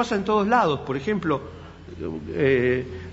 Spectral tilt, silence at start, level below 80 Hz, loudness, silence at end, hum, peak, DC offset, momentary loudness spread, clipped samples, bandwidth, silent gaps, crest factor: -6.5 dB/octave; 0 s; -48 dBFS; -23 LUFS; 0 s; none; -6 dBFS; under 0.1%; 17 LU; under 0.1%; 8 kHz; none; 18 dB